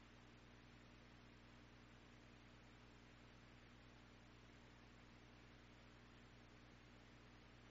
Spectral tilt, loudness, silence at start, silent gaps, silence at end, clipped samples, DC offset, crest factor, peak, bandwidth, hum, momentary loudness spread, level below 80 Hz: -4 dB/octave; -66 LUFS; 0 s; none; 0 s; under 0.1%; under 0.1%; 14 dB; -52 dBFS; 7.6 kHz; 60 Hz at -70 dBFS; 0 LU; -72 dBFS